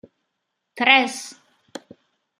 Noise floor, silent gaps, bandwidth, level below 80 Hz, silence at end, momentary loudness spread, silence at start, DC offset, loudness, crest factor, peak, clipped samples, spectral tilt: -78 dBFS; none; 15 kHz; -80 dBFS; 1.1 s; 26 LU; 0.75 s; under 0.1%; -17 LUFS; 24 dB; 0 dBFS; under 0.1%; -1 dB/octave